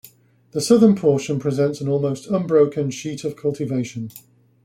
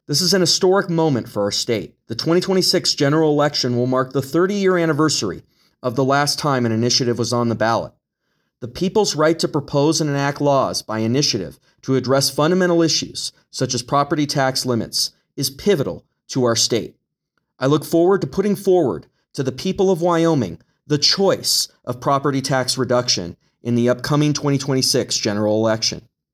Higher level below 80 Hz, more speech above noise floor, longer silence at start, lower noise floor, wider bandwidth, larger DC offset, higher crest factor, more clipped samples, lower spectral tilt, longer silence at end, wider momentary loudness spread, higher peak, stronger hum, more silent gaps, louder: second, -60 dBFS vs -54 dBFS; second, 30 dB vs 55 dB; first, 0.55 s vs 0.1 s; second, -50 dBFS vs -73 dBFS; second, 15.5 kHz vs 19 kHz; neither; about the same, 18 dB vs 16 dB; neither; first, -6.5 dB/octave vs -4.5 dB/octave; about the same, 0.45 s vs 0.35 s; first, 14 LU vs 9 LU; about the same, -2 dBFS vs -2 dBFS; neither; neither; about the same, -20 LUFS vs -18 LUFS